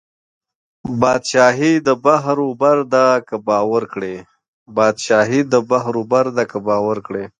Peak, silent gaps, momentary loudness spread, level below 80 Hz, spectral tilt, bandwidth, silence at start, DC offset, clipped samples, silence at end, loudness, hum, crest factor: 0 dBFS; 4.48-4.66 s; 11 LU; -58 dBFS; -5 dB/octave; 10 kHz; 0.85 s; under 0.1%; under 0.1%; 0.1 s; -16 LUFS; none; 16 dB